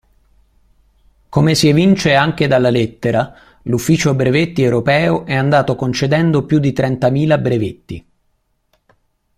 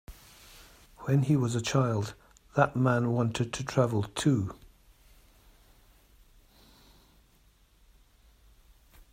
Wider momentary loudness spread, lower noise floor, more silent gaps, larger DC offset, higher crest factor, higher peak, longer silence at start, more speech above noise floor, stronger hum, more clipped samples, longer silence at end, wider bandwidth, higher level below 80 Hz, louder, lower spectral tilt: second, 9 LU vs 26 LU; about the same, -63 dBFS vs -63 dBFS; neither; neither; second, 16 dB vs 22 dB; first, 0 dBFS vs -8 dBFS; first, 1.3 s vs 0.1 s; first, 50 dB vs 36 dB; neither; neither; second, 1.4 s vs 4.6 s; about the same, 15 kHz vs 15.5 kHz; first, -44 dBFS vs -58 dBFS; first, -14 LUFS vs -29 LUFS; about the same, -6 dB/octave vs -6.5 dB/octave